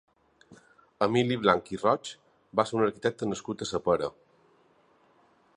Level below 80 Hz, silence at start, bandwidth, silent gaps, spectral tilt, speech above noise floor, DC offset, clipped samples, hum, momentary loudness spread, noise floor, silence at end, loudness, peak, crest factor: -62 dBFS; 0.5 s; 11 kHz; none; -5.5 dB/octave; 37 dB; under 0.1%; under 0.1%; none; 9 LU; -64 dBFS; 1.45 s; -28 LUFS; -6 dBFS; 24 dB